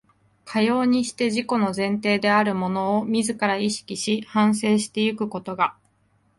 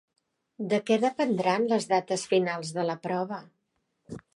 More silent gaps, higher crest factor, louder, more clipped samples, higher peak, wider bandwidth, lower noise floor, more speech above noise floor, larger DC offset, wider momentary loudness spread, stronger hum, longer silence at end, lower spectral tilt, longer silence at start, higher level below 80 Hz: neither; about the same, 18 dB vs 18 dB; first, -22 LUFS vs -27 LUFS; neither; first, -6 dBFS vs -10 dBFS; about the same, 11.5 kHz vs 11.5 kHz; second, -64 dBFS vs -77 dBFS; second, 42 dB vs 50 dB; neither; second, 6 LU vs 13 LU; neither; first, 0.65 s vs 0.15 s; about the same, -4.5 dB/octave vs -5 dB/octave; second, 0.45 s vs 0.6 s; first, -64 dBFS vs -72 dBFS